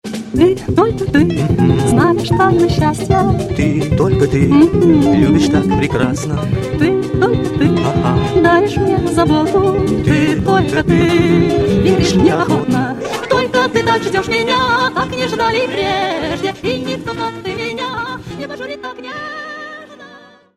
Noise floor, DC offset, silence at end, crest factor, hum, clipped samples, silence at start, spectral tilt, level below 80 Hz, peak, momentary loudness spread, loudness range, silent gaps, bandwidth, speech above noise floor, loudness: -41 dBFS; under 0.1%; 0.4 s; 14 dB; none; under 0.1%; 0.05 s; -6.5 dB/octave; -32 dBFS; 0 dBFS; 11 LU; 7 LU; none; 13.5 kHz; 28 dB; -14 LUFS